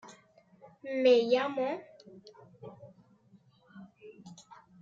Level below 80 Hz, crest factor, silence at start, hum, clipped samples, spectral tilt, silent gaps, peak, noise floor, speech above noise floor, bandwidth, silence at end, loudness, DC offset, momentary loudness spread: -84 dBFS; 20 dB; 0.05 s; none; under 0.1%; -5 dB/octave; none; -14 dBFS; -63 dBFS; 35 dB; 7.6 kHz; 0.5 s; -29 LUFS; under 0.1%; 29 LU